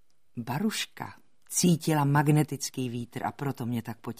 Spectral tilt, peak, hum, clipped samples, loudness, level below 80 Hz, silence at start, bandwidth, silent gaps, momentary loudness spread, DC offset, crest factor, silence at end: -5 dB/octave; -10 dBFS; none; under 0.1%; -28 LUFS; -64 dBFS; 0.35 s; 15.5 kHz; none; 14 LU; 0.2%; 18 dB; 0.05 s